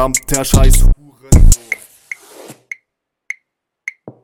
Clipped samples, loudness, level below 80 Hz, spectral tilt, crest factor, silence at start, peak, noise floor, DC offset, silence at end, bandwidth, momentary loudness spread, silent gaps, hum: under 0.1%; -14 LUFS; -14 dBFS; -4.5 dB/octave; 12 dB; 0 s; 0 dBFS; -75 dBFS; under 0.1%; 0.15 s; 17 kHz; 20 LU; none; none